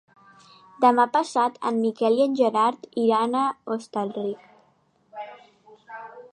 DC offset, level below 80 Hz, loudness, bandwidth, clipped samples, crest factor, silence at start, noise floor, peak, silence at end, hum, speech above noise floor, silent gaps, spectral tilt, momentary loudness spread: under 0.1%; -80 dBFS; -23 LUFS; 11 kHz; under 0.1%; 20 dB; 0.8 s; -64 dBFS; -4 dBFS; 0.05 s; none; 41 dB; none; -5 dB/octave; 20 LU